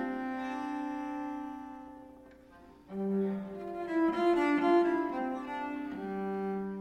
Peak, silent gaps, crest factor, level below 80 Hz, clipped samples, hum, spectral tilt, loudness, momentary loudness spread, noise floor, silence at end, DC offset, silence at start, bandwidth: -16 dBFS; none; 16 dB; -66 dBFS; under 0.1%; none; -7.5 dB/octave; -33 LUFS; 17 LU; -56 dBFS; 0 s; under 0.1%; 0 s; 9.2 kHz